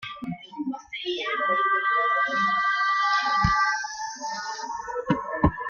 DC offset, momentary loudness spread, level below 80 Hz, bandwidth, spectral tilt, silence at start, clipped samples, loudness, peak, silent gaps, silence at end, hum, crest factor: under 0.1%; 11 LU; -44 dBFS; 7.2 kHz; -4 dB/octave; 0 s; under 0.1%; -25 LUFS; -6 dBFS; none; 0 s; none; 18 dB